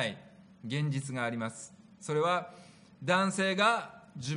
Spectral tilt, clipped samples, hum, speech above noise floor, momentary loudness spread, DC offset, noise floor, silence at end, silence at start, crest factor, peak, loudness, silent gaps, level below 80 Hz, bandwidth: -4.5 dB/octave; under 0.1%; none; 23 dB; 20 LU; under 0.1%; -54 dBFS; 0 s; 0 s; 22 dB; -12 dBFS; -31 LUFS; none; -76 dBFS; 10.5 kHz